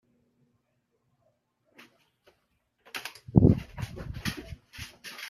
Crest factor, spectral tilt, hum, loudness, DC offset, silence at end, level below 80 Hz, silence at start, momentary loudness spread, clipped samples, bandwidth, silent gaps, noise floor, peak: 28 dB; -7 dB/octave; none; -28 LUFS; under 0.1%; 0 s; -46 dBFS; 2.95 s; 21 LU; under 0.1%; 14.5 kHz; none; -76 dBFS; -4 dBFS